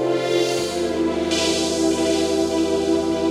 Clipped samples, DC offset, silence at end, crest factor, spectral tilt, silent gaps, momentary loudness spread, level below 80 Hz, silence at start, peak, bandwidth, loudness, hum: under 0.1%; under 0.1%; 0 s; 14 dB; -4 dB/octave; none; 3 LU; -46 dBFS; 0 s; -6 dBFS; 13.5 kHz; -20 LUFS; none